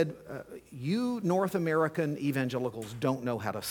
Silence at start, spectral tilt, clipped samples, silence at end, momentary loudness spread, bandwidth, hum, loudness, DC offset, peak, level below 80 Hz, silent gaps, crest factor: 0 s; -6.5 dB/octave; under 0.1%; 0 s; 13 LU; 19 kHz; none; -31 LUFS; under 0.1%; -14 dBFS; -68 dBFS; none; 18 dB